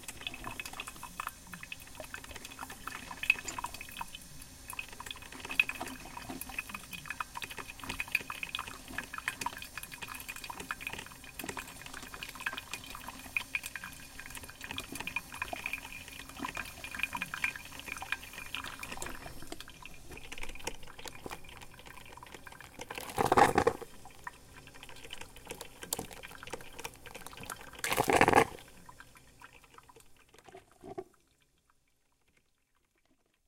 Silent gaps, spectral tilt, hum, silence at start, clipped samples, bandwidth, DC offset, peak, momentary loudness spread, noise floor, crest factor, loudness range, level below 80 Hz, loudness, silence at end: none; -3 dB/octave; none; 0 s; under 0.1%; 17 kHz; under 0.1%; -6 dBFS; 19 LU; -75 dBFS; 34 dB; 13 LU; -56 dBFS; -37 LUFS; 2.45 s